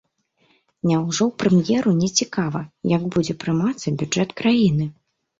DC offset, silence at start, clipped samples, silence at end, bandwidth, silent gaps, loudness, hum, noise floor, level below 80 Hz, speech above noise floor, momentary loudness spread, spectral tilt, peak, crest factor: under 0.1%; 0.85 s; under 0.1%; 0.5 s; 7.8 kHz; none; -21 LUFS; none; -64 dBFS; -54 dBFS; 44 dB; 8 LU; -5.5 dB/octave; -4 dBFS; 18 dB